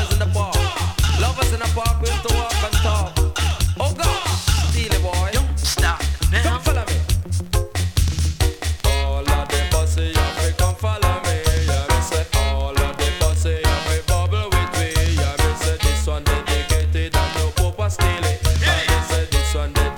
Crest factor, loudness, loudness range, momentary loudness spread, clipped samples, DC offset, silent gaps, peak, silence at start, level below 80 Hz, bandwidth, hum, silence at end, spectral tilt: 16 dB; -20 LUFS; 1 LU; 2 LU; under 0.1%; under 0.1%; none; -2 dBFS; 0 s; -22 dBFS; 18.5 kHz; none; 0 s; -4 dB/octave